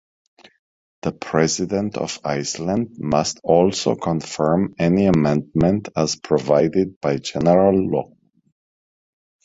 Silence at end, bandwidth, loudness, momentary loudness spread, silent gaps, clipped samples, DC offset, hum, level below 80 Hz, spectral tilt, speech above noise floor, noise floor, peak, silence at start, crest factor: 1.4 s; 8 kHz; -20 LUFS; 8 LU; 6.96-7.01 s; under 0.1%; under 0.1%; none; -48 dBFS; -5.5 dB/octave; over 71 dB; under -90 dBFS; 0 dBFS; 1.05 s; 20 dB